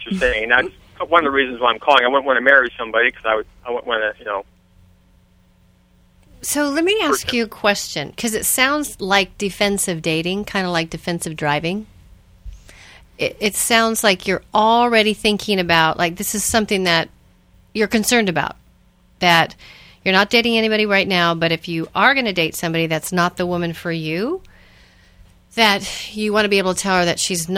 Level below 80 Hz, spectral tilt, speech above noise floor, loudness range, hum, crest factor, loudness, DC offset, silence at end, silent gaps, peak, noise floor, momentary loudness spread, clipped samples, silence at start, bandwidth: -46 dBFS; -3 dB/octave; 36 dB; 7 LU; none; 20 dB; -17 LUFS; under 0.1%; 0 s; none; 0 dBFS; -54 dBFS; 10 LU; under 0.1%; 0 s; 17 kHz